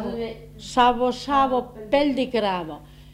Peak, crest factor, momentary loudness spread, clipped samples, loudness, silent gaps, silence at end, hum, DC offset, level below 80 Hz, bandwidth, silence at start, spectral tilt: -4 dBFS; 18 dB; 15 LU; under 0.1%; -22 LUFS; none; 0 s; 50 Hz at -50 dBFS; under 0.1%; -46 dBFS; 15.5 kHz; 0 s; -5 dB/octave